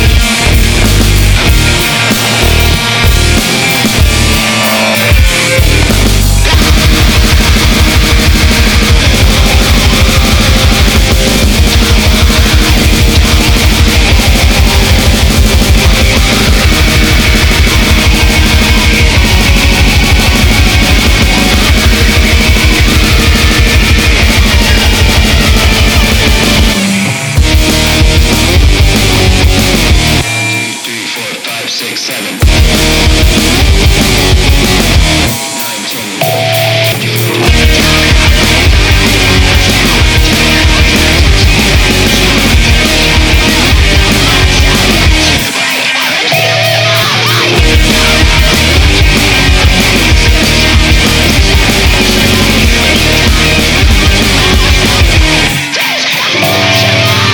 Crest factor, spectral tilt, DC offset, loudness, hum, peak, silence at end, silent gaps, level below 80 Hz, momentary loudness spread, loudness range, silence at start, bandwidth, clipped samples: 6 dB; -3.5 dB/octave; under 0.1%; -7 LUFS; none; 0 dBFS; 0 s; none; -10 dBFS; 2 LU; 2 LU; 0 s; over 20 kHz; 2%